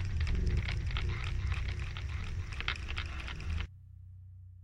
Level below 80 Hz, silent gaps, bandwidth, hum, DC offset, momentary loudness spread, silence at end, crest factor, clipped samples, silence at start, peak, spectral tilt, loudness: -38 dBFS; none; 9.6 kHz; none; under 0.1%; 18 LU; 0 s; 20 dB; under 0.1%; 0 s; -16 dBFS; -5.5 dB/octave; -37 LUFS